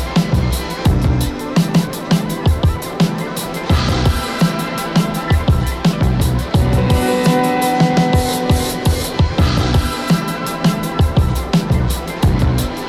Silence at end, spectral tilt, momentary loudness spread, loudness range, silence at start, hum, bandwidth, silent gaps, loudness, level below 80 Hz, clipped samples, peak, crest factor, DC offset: 0 s; -6 dB/octave; 4 LU; 2 LU; 0 s; none; 16 kHz; none; -16 LUFS; -22 dBFS; under 0.1%; -2 dBFS; 14 dB; under 0.1%